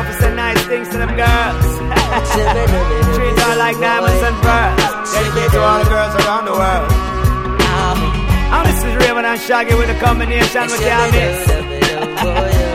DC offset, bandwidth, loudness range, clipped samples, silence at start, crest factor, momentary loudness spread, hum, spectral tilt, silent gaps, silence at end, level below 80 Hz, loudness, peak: under 0.1%; 16.5 kHz; 1 LU; under 0.1%; 0 s; 14 dB; 4 LU; none; -5 dB/octave; none; 0 s; -20 dBFS; -14 LUFS; 0 dBFS